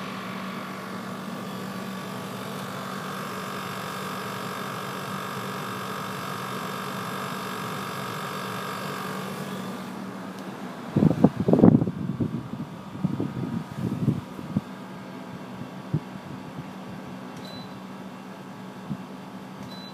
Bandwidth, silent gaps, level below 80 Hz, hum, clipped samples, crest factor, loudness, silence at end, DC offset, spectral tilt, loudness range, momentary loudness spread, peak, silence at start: 15.5 kHz; none; -58 dBFS; none; under 0.1%; 28 dB; -30 LUFS; 0 s; under 0.1%; -6.5 dB/octave; 13 LU; 15 LU; 0 dBFS; 0 s